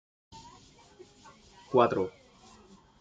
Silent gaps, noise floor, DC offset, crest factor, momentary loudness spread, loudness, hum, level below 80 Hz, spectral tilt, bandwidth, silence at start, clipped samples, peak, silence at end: none; -57 dBFS; under 0.1%; 26 dB; 27 LU; -28 LUFS; none; -68 dBFS; -6.5 dB/octave; 7.8 kHz; 0.35 s; under 0.1%; -8 dBFS; 0.9 s